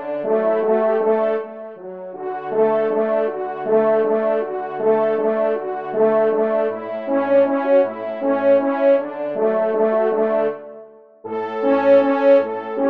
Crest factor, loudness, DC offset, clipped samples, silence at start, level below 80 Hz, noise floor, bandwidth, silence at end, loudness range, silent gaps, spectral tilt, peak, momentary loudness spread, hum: 14 dB; -18 LUFS; 0.2%; under 0.1%; 0 s; -72 dBFS; -42 dBFS; 4.7 kHz; 0 s; 2 LU; none; -8.5 dB/octave; -4 dBFS; 12 LU; none